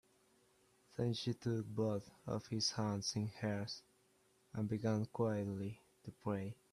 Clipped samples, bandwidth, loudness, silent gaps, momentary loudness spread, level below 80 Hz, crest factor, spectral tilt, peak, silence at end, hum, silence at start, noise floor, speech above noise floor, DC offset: under 0.1%; 13.5 kHz; -41 LUFS; none; 10 LU; -74 dBFS; 18 dB; -5.5 dB/octave; -24 dBFS; 0.2 s; none; 1 s; -74 dBFS; 34 dB; under 0.1%